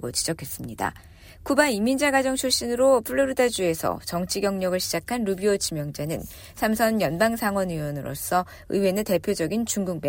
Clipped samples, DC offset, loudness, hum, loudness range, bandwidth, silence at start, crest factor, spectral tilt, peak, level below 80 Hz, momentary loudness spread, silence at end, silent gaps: under 0.1%; under 0.1%; -24 LUFS; none; 3 LU; 17 kHz; 0 s; 18 dB; -4 dB/octave; -6 dBFS; -50 dBFS; 10 LU; 0 s; none